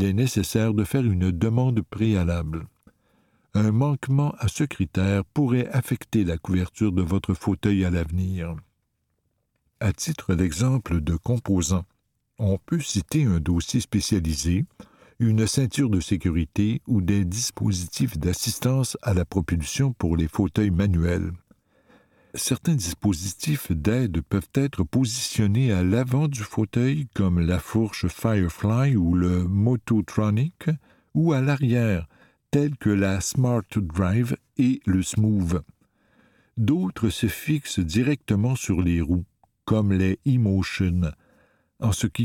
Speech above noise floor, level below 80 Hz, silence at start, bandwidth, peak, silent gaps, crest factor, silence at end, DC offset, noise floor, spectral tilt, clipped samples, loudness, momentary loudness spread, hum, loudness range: 51 dB; -40 dBFS; 0 s; 17.5 kHz; -6 dBFS; none; 18 dB; 0 s; under 0.1%; -74 dBFS; -6 dB/octave; under 0.1%; -24 LUFS; 5 LU; none; 3 LU